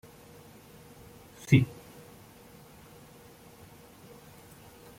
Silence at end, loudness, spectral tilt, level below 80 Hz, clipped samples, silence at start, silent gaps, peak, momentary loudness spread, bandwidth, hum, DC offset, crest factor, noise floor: 3.35 s; -26 LUFS; -7 dB/octave; -62 dBFS; under 0.1%; 1.5 s; none; -8 dBFS; 28 LU; 16.5 kHz; none; under 0.1%; 28 dB; -53 dBFS